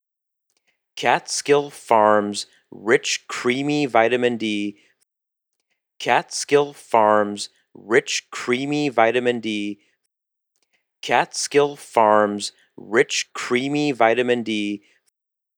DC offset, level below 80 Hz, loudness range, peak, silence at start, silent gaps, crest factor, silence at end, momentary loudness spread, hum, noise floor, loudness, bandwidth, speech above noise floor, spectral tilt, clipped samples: under 0.1%; -80 dBFS; 3 LU; 0 dBFS; 0.95 s; none; 20 dB; 0.8 s; 12 LU; none; -83 dBFS; -20 LUFS; 18 kHz; 62 dB; -3.5 dB/octave; under 0.1%